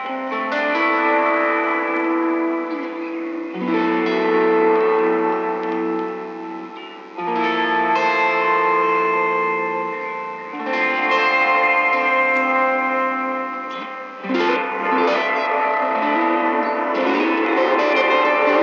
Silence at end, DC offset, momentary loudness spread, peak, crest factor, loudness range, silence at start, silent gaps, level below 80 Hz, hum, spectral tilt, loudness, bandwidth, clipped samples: 0 s; under 0.1%; 11 LU; -4 dBFS; 14 dB; 3 LU; 0 s; none; under -90 dBFS; none; -5.5 dB/octave; -19 LUFS; 7.2 kHz; under 0.1%